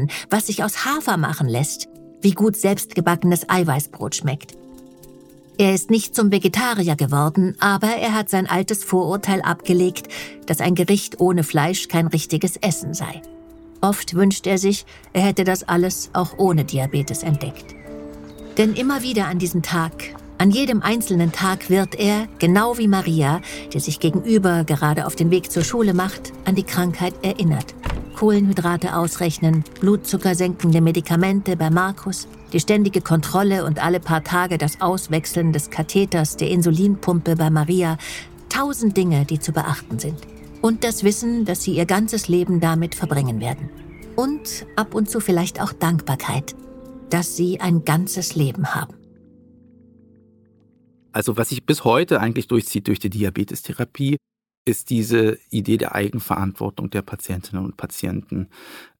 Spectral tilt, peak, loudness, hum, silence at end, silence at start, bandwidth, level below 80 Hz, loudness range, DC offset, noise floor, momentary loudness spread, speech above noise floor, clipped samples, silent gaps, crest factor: -5.5 dB/octave; -2 dBFS; -20 LUFS; none; 0.15 s; 0 s; 17.5 kHz; -46 dBFS; 4 LU; under 0.1%; -56 dBFS; 10 LU; 37 dB; under 0.1%; 54.57-54.66 s; 18 dB